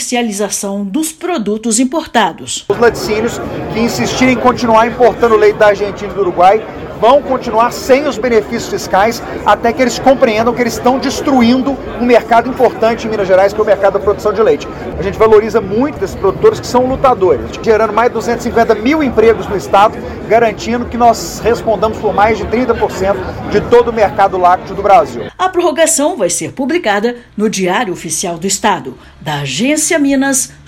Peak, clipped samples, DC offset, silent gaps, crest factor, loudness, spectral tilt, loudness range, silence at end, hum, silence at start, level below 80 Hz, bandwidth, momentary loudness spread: 0 dBFS; 1%; under 0.1%; none; 12 dB; -12 LUFS; -4 dB/octave; 3 LU; 0.15 s; none; 0 s; -36 dBFS; 17.5 kHz; 7 LU